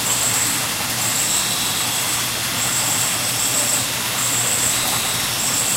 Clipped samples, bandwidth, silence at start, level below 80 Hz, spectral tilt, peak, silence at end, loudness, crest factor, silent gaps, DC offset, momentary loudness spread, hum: under 0.1%; 16 kHz; 0 s; -48 dBFS; -0.5 dB/octave; -6 dBFS; 0 s; -17 LUFS; 14 dB; none; under 0.1%; 3 LU; none